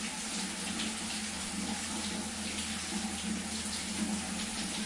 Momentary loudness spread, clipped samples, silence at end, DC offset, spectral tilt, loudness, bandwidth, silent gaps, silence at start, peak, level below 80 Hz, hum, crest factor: 1 LU; under 0.1%; 0 s; under 0.1%; -2 dB/octave; -35 LUFS; 11.5 kHz; none; 0 s; -22 dBFS; -58 dBFS; none; 14 dB